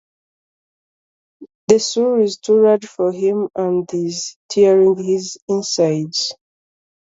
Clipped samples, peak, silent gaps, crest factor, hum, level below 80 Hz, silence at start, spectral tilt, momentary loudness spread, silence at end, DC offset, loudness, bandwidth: under 0.1%; 0 dBFS; 1.55-1.68 s, 4.36-4.49 s, 5.42-5.48 s; 18 dB; none; -64 dBFS; 1.4 s; -4.5 dB/octave; 9 LU; 0.8 s; under 0.1%; -17 LUFS; 7.8 kHz